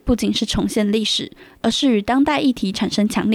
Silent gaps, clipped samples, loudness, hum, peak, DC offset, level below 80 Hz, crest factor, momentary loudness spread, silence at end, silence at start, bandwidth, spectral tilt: none; under 0.1%; -19 LUFS; none; -6 dBFS; under 0.1%; -38 dBFS; 14 dB; 5 LU; 0 s; 0.05 s; 14 kHz; -4.5 dB/octave